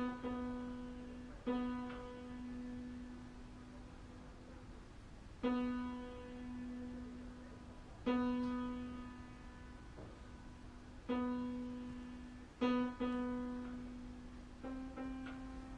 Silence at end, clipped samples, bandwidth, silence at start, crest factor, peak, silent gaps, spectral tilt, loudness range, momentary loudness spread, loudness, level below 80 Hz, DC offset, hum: 0 s; under 0.1%; 9.8 kHz; 0 s; 20 dB; -24 dBFS; none; -7 dB/octave; 5 LU; 17 LU; -44 LUFS; -58 dBFS; under 0.1%; none